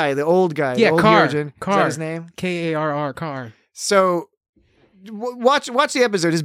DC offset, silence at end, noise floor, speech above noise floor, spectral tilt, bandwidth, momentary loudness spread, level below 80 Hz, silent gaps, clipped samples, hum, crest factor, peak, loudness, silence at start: under 0.1%; 0 s; -54 dBFS; 35 dB; -5 dB/octave; 15.5 kHz; 14 LU; -60 dBFS; 4.37-4.41 s, 4.49-4.53 s; under 0.1%; none; 18 dB; -2 dBFS; -19 LUFS; 0 s